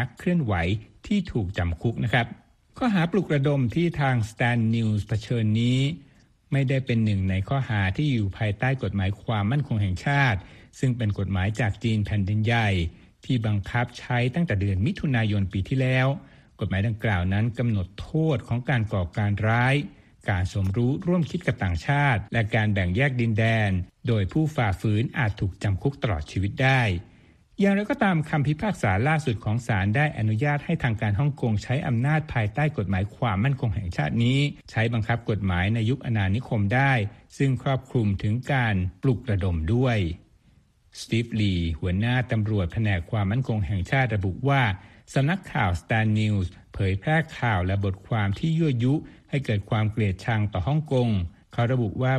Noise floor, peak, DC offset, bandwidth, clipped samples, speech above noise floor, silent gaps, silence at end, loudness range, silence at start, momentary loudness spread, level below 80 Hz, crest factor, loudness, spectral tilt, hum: -59 dBFS; -6 dBFS; under 0.1%; 10 kHz; under 0.1%; 35 dB; none; 0 s; 2 LU; 0 s; 5 LU; -44 dBFS; 18 dB; -25 LUFS; -7.5 dB/octave; none